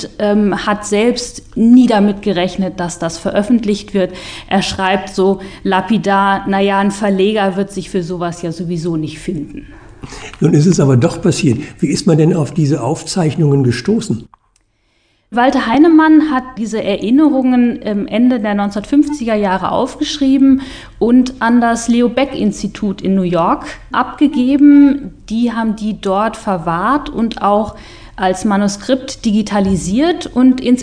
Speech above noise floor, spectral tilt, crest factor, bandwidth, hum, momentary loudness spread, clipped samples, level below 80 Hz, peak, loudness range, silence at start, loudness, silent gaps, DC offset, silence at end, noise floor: 46 dB; -6 dB/octave; 14 dB; 10 kHz; none; 10 LU; under 0.1%; -40 dBFS; 0 dBFS; 4 LU; 0 s; -14 LUFS; none; 0.2%; 0 s; -59 dBFS